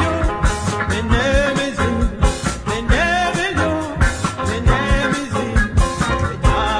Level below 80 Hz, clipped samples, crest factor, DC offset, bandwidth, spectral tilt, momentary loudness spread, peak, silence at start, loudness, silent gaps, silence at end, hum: -22 dBFS; under 0.1%; 14 dB; under 0.1%; 10.5 kHz; -5 dB/octave; 4 LU; -2 dBFS; 0 s; -18 LUFS; none; 0 s; none